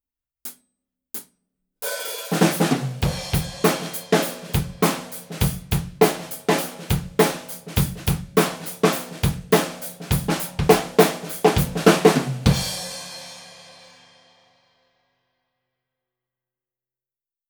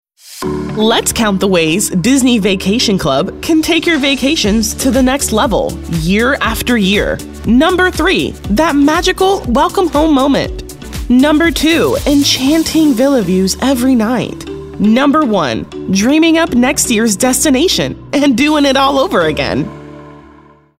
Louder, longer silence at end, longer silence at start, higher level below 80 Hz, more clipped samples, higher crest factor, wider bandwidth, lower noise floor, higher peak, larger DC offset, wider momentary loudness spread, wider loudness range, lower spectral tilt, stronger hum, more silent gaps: second, -22 LUFS vs -11 LUFS; first, 3.8 s vs 0.6 s; first, 0.45 s vs 0.25 s; second, -38 dBFS vs -30 dBFS; neither; first, 22 dB vs 12 dB; first, over 20 kHz vs 16.5 kHz; first, under -90 dBFS vs -42 dBFS; about the same, -2 dBFS vs 0 dBFS; second, under 0.1% vs 0.2%; first, 16 LU vs 8 LU; first, 6 LU vs 2 LU; about the same, -5 dB/octave vs -4 dB/octave; neither; neither